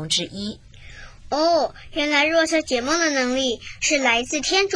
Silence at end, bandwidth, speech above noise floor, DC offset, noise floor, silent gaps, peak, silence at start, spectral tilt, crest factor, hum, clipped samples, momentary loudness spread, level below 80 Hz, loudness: 0 s; 10.5 kHz; 20 dB; under 0.1%; -41 dBFS; none; -4 dBFS; 0 s; -2 dB/octave; 18 dB; none; under 0.1%; 10 LU; -46 dBFS; -20 LUFS